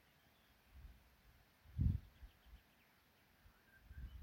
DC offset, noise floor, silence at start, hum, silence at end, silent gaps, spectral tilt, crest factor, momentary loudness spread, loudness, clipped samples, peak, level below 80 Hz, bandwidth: under 0.1%; -73 dBFS; 0.75 s; none; 0 s; none; -8 dB/octave; 24 dB; 27 LU; -45 LUFS; under 0.1%; -26 dBFS; -54 dBFS; 16.5 kHz